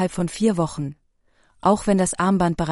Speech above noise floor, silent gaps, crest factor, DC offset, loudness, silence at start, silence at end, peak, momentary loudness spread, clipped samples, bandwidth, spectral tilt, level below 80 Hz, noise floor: 41 dB; none; 16 dB; under 0.1%; -21 LUFS; 0 s; 0 s; -6 dBFS; 8 LU; under 0.1%; 11.5 kHz; -6 dB/octave; -44 dBFS; -61 dBFS